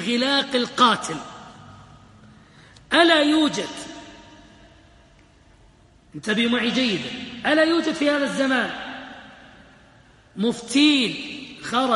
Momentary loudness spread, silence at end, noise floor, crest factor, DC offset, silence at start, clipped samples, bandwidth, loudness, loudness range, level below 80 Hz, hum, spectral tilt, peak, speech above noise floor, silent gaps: 20 LU; 0 s; -53 dBFS; 22 dB; under 0.1%; 0 s; under 0.1%; 11.5 kHz; -21 LUFS; 5 LU; -58 dBFS; none; -3.5 dB/octave; 0 dBFS; 33 dB; none